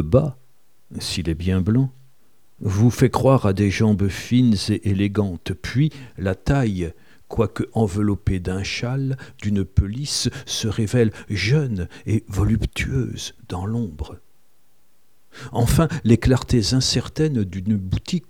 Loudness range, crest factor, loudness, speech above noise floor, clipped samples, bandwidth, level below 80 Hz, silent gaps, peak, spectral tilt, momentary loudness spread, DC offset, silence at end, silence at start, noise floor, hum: 6 LU; 18 dB; -21 LUFS; 44 dB; under 0.1%; 16.5 kHz; -36 dBFS; none; -2 dBFS; -6 dB/octave; 11 LU; 0.5%; 0.1 s; 0 s; -64 dBFS; none